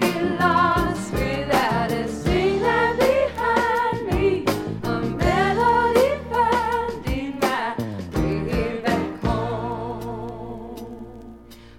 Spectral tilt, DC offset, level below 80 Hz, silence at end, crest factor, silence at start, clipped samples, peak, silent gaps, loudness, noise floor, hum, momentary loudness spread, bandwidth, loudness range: -6 dB/octave; under 0.1%; -36 dBFS; 0 s; 16 dB; 0 s; under 0.1%; -6 dBFS; none; -22 LUFS; -43 dBFS; none; 13 LU; 17 kHz; 6 LU